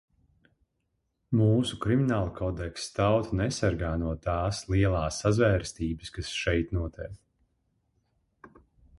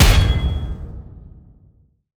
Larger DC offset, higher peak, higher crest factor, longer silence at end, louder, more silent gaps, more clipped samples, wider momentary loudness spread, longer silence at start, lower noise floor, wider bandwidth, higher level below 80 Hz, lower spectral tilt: neither; second, -10 dBFS vs 0 dBFS; about the same, 18 dB vs 18 dB; second, 0.5 s vs 1 s; second, -28 LUFS vs -20 LUFS; neither; neither; second, 9 LU vs 25 LU; first, 1.3 s vs 0 s; first, -78 dBFS vs -54 dBFS; second, 11.5 kHz vs over 20 kHz; second, -42 dBFS vs -22 dBFS; first, -6 dB/octave vs -4.5 dB/octave